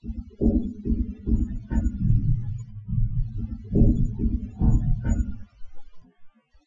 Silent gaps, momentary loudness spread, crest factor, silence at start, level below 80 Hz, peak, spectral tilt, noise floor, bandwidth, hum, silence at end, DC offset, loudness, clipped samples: none; 11 LU; 18 dB; 0.05 s; -28 dBFS; -6 dBFS; -10.5 dB/octave; -47 dBFS; 7.4 kHz; none; 0.4 s; under 0.1%; -26 LUFS; under 0.1%